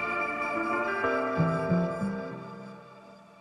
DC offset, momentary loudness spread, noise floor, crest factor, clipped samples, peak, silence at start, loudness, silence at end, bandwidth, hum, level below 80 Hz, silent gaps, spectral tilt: under 0.1%; 18 LU; -51 dBFS; 16 dB; under 0.1%; -14 dBFS; 0 s; -29 LUFS; 0 s; 10 kHz; none; -62 dBFS; none; -7.5 dB/octave